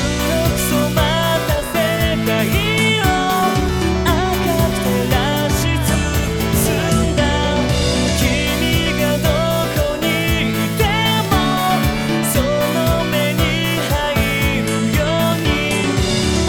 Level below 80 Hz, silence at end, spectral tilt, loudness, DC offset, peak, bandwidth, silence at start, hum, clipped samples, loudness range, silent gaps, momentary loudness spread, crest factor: -26 dBFS; 0 s; -4.5 dB/octave; -16 LUFS; 0.2%; -2 dBFS; 17.5 kHz; 0 s; none; under 0.1%; 1 LU; none; 2 LU; 14 dB